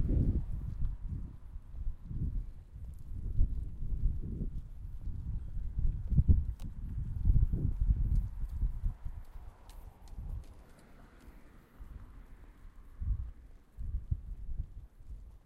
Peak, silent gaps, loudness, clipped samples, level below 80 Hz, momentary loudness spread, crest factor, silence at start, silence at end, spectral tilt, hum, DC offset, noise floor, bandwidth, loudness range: -12 dBFS; none; -38 LUFS; under 0.1%; -36 dBFS; 25 LU; 22 dB; 0 s; 0.1 s; -10 dB/octave; none; under 0.1%; -56 dBFS; 2.4 kHz; 16 LU